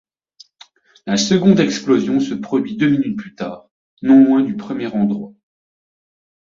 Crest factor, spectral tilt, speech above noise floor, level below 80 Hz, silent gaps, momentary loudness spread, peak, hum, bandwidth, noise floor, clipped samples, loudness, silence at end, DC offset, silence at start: 16 dB; -5.5 dB/octave; 34 dB; -58 dBFS; 3.71-3.97 s; 17 LU; -2 dBFS; none; 7.6 kHz; -49 dBFS; under 0.1%; -16 LUFS; 1.15 s; under 0.1%; 1.05 s